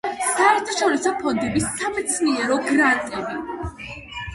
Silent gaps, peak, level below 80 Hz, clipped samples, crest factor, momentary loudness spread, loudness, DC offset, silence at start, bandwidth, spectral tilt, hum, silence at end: none; -4 dBFS; -46 dBFS; under 0.1%; 18 dB; 14 LU; -21 LUFS; under 0.1%; 0.05 s; 11.5 kHz; -3.5 dB/octave; none; 0 s